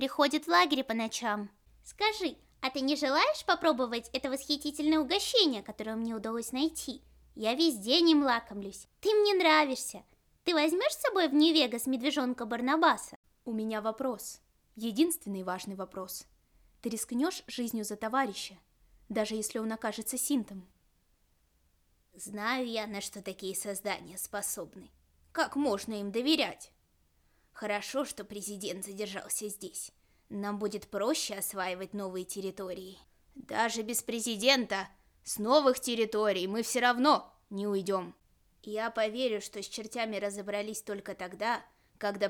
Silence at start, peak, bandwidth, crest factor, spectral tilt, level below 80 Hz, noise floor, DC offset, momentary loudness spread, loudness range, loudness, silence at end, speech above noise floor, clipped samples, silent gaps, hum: 0 s; -12 dBFS; 19 kHz; 22 dB; -2.5 dB/octave; -68 dBFS; -71 dBFS; under 0.1%; 15 LU; 9 LU; -31 LUFS; 0 s; 39 dB; under 0.1%; 13.16-13.23 s; none